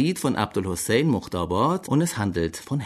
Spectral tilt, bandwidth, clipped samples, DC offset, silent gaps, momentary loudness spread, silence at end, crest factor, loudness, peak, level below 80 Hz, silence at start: -5.5 dB/octave; 13.5 kHz; under 0.1%; under 0.1%; none; 5 LU; 0 s; 18 dB; -24 LUFS; -6 dBFS; -48 dBFS; 0 s